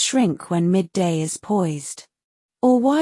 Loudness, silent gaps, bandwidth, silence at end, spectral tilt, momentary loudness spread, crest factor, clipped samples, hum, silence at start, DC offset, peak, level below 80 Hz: -21 LUFS; 2.24-2.49 s; 12 kHz; 0 s; -5 dB/octave; 11 LU; 14 dB; under 0.1%; none; 0 s; under 0.1%; -6 dBFS; -64 dBFS